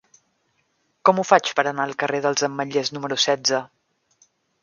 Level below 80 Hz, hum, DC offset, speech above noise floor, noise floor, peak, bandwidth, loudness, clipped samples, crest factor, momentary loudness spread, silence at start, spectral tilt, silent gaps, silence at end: -74 dBFS; none; under 0.1%; 48 dB; -69 dBFS; 0 dBFS; 7.4 kHz; -21 LUFS; under 0.1%; 22 dB; 7 LU; 1.05 s; -3 dB/octave; none; 0.95 s